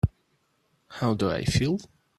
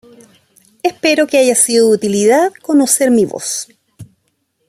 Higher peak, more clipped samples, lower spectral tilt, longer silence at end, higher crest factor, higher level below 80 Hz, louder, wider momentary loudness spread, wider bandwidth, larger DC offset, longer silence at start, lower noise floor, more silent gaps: second, -10 dBFS vs 0 dBFS; neither; first, -6 dB/octave vs -3 dB/octave; second, 0.35 s vs 0.65 s; first, 20 dB vs 14 dB; first, -44 dBFS vs -60 dBFS; second, -27 LUFS vs -12 LUFS; second, 7 LU vs 10 LU; second, 13 kHz vs 15.5 kHz; neither; second, 0.05 s vs 0.85 s; first, -70 dBFS vs -65 dBFS; neither